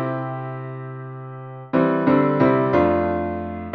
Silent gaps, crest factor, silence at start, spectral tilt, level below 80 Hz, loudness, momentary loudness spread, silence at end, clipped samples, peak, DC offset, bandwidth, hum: none; 16 dB; 0 s; -10 dB/octave; -48 dBFS; -20 LUFS; 17 LU; 0 s; under 0.1%; -6 dBFS; under 0.1%; 5.8 kHz; none